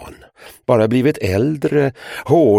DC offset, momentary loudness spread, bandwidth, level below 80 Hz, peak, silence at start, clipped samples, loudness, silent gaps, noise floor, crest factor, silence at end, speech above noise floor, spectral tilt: under 0.1%; 9 LU; 16 kHz; -50 dBFS; 0 dBFS; 0 s; under 0.1%; -16 LUFS; none; -43 dBFS; 16 dB; 0 s; 28 dB; -7.5 dB/octave